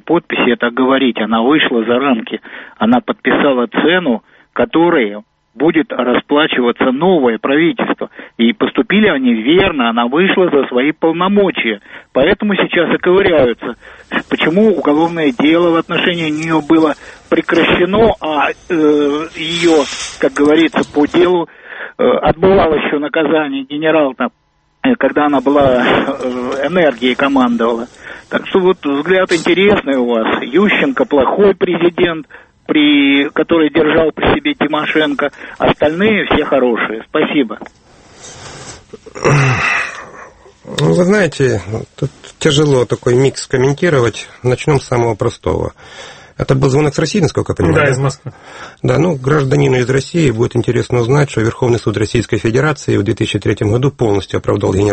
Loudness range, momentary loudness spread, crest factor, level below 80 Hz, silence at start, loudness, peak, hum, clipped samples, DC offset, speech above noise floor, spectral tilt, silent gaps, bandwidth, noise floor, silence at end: 3 LU; 10 LU; 12 dB; -40 dBFS; 0.05 s; -13 LUFS; 0 dBFS; none; under 0.1%; under 0.1%; 25 dB; -6 dB/octave; none; 8.8 kHz; -37 dBFS; 0 s